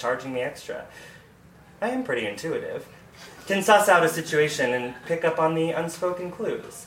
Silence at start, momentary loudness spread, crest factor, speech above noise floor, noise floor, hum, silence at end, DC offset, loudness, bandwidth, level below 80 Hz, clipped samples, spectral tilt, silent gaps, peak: 0 s; 19 LU; 20 dB; 26 dB; -51 dBFS; none; 0 s; under 0.1%; -24 LUFS; 16.5 kHz; -62 dBFS; under 0.1%; -4 dB/octave; none; -4 dBFS